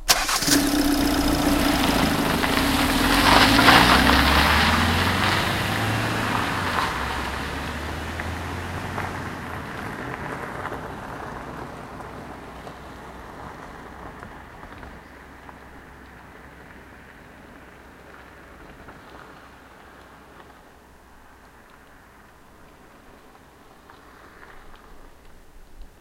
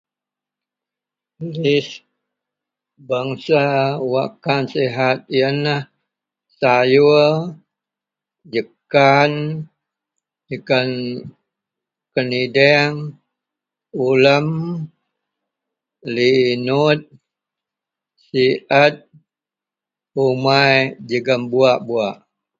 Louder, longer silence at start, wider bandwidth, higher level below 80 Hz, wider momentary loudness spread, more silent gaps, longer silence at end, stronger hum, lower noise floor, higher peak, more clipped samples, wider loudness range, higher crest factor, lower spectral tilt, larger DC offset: second, -20 LUFS vs -17 LUFS; second, 0 s vs 1.4 s; first, 16 kHz vs 7.4 kHz; first, -36 dBFS vs -62 dBFS; first, 27 LU vs 16 LU; neither; second, 0.15 s vs 0.45 s; neither; second, -49 dBFS vs -88 dBFS; about the same, 0 dBFS vs 0 dBFS; neither; first, 25 LU vs 4 LU; first, 24 dB vs 18 dB; second, -3.5 dB/octave vs -6.5 dB/octave; neither